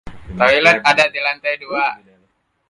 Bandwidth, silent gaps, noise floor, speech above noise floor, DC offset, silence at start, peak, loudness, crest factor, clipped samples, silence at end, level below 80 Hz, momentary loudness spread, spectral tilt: 11.5 kHz; none; -63 dBFS; 47 dB; under 0.1%; 0.05 s; 0 dBFS; -15 LUFS; 18 dB; under 0.1%; 0.75 s; -46 dBFS; 10 LU; -3.5 dB/octave